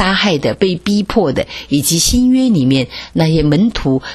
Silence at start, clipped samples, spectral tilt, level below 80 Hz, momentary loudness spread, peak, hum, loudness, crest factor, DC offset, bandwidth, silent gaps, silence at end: 0 s; under 0.1%; -4.5 dB/octave; -30 dBFS; 6 LU; 0 dBFS; none; -13 LUFS; 14 dB; under 0.1%; 13 kHz; none; 0 s